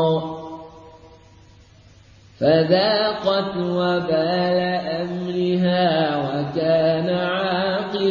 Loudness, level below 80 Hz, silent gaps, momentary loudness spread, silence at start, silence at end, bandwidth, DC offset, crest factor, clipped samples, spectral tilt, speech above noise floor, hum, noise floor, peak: -20 LUFS; -56 dBFS; none; 8 LU; 0 s; 0 s; 7.2 kHz; under 0.1%; 16 dB; under 0.1%; -7.5 dB/octave; 29 dB; none; -49 dBFS; -4 dBFS